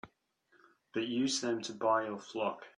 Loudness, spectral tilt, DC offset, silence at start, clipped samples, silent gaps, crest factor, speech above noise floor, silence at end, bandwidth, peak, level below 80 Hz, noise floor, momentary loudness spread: -34 LUFS; -3.5 dB/octave; under 0.1%; 0.05 s; under 0.1%; none; 18 dB; 38 dB; 0.1 s; 10.5 kHz; -18 dBFS; -78 dBFS; -72 dBFS; 7 LU